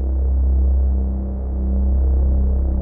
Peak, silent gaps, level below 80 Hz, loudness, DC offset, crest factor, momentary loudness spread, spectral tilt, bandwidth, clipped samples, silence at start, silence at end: -8 dBFS; none; -16 dBFS; -20 LUFS; under 0.1%; 8 dB; 6 LU; -15.5 dB/octave; 1.4 kHz; under 0.1%; 0 s; 0 s